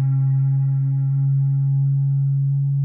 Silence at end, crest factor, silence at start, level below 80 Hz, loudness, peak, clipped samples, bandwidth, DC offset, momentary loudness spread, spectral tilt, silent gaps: 0 s; 4 dB; 0 s; -74 dBFS; -20 LUFS; -14 dBFS; under 0.1%; 1.4 kHz; under 0.1%; 1 LU; -16 dB/octave; none